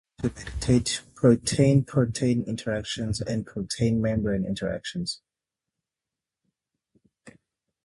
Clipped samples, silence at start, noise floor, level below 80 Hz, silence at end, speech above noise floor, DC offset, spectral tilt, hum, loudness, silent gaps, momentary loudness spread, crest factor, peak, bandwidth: under 0.1%; 0.2 s; -89 dBFS; -46 dBFS; 0.55 s; 64 dB; under 0.1%; -6 dB/octave; none; -26 LUFS; none; 11 LU; 20 dB; -6 dBFS; 11.5 kHz